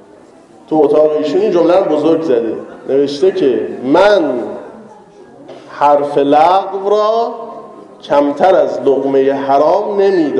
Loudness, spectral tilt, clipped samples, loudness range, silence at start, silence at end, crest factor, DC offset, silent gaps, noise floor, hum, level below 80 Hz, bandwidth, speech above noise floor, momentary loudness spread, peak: -12 LUFS; -6 dB/octave; under 0.1%; 2 LU; 0.7 s; 0 s; 12 dB; under 0.1%; none; -41 dBFS; none; -56 dBFS; 10.5 kHz; 29 dB; 11 LU; 0 dBFS